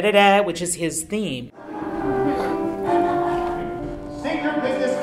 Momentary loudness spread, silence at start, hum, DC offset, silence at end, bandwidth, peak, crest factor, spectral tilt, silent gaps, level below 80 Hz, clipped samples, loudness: 13 LU; 0 s; none; under 0.1%; 0 s; 16 kHz; -2 dBFS; 20 dB; -4 dB/octave; none; -46 dBFS; under 0.1%; -22 LUFS